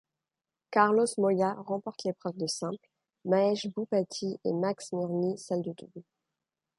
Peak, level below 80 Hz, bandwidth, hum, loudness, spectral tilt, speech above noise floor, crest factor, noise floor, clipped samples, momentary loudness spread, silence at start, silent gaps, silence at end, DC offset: -8 dBFS; -78 dBFS; 11.5 kHz; none; -30 LUFS; -5 dB/octave; over 60 dB; 22 dB; under -90 dBFS; under 0.1%; 12 LU; 0.7 s; none; 0.8 s; under 0.1%